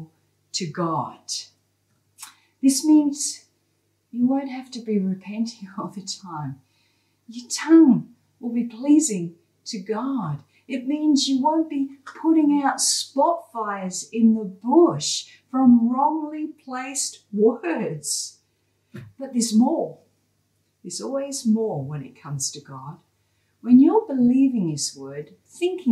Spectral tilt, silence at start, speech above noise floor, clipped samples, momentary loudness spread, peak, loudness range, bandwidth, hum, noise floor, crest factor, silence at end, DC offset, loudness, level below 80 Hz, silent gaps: -4.5 dB/octave; 0 s; 47 dB; under 0.1%; 18 LU; -4 dBFS; 7 LU; 13.5 kHz; none; -69 dBFS; 18 dB; 0 s; under 0.1%; -22 LUFS; -72 dBFS; none